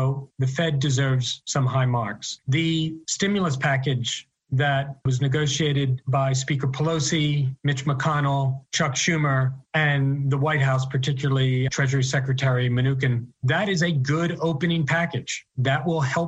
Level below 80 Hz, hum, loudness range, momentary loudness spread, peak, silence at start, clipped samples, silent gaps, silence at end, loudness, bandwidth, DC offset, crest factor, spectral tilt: -56 dBFS; none; 2 LU; 5 LU; -8 dBFS; 0 s; under 0.1%; none; 0 s; -23 LUFS; 8.2 kHz; under 0.1%; 16 dB; -5 dB/octave